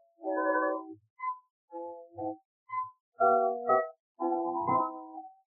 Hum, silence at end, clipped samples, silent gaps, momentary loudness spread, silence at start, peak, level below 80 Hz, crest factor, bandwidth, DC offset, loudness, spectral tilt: none; 0.15 s; under 0.1%; 1.10-1.16 s, 1.50-1.68 s, 2.45-2.66 s, 3.00-3.12 s, 4.00-4.15 s; 17 LU; 0.2 s; -14 dBFS; under -90 dBFS; 18 dB; 2.2 kHz; under 0.1%; -31 LUFS; -8 dB/octave